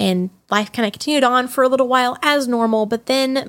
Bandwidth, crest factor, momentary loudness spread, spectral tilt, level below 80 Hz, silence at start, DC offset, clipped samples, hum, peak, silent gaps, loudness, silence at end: 17 kHz; 16 dB; 5 LU; -4.5 dB/octave; -64 dBFS; 0 s; under 0.1%; under 0.1%; none; -2 dBFS; none; -17 LUFS; 0 s